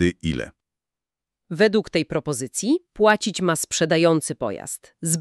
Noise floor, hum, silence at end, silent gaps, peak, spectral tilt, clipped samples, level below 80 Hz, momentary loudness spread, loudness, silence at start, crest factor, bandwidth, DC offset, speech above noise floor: -89 dBFS; none; 0 s; none; -2 dBFS; -4 dB/octave; under 0.1%; -50 dBFS; 12 LU; -22 LUFS; 0 s; 20 dB; 13.5 kHz; under 0.1%; 68 dB